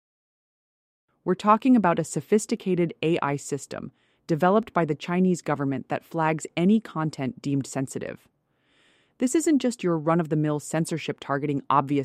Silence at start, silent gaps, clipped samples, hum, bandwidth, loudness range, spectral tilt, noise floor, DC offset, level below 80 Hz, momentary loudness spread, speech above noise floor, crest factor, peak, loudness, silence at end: 1.25 s; none; under 0.1%; none; 15 kHz; 3 LU; -6 dB/octave; -67 dBFS; under 0.1%; -68 dBFS; 10 LU; 43 dB; 20 dB; -6 dBFS; -25 LUFS; 0 s